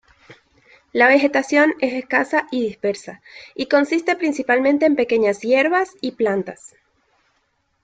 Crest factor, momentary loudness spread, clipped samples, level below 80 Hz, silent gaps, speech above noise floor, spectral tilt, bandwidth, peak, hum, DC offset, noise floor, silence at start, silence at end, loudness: 18 dB; 12 LU; under 0.1%; -64 dBFS; none; 49 dB; -4.5 dB/octave; 9.2 kHz; -2 dBFS; none; under 0.1%; -67 dBFS; 0.3 s; 1.15 s; -18 LUFS